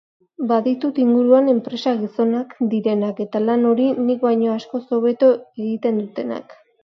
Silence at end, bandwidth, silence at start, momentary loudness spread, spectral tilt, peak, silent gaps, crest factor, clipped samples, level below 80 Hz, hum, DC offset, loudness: 0.3 s; 6.2 kHz; 0.4 s; 10 LU; -8 dB/octave; -2 dBFS; none; 16 dB; under 0.1%; -72 dBFS; none; under 0.1%; -19 LUFS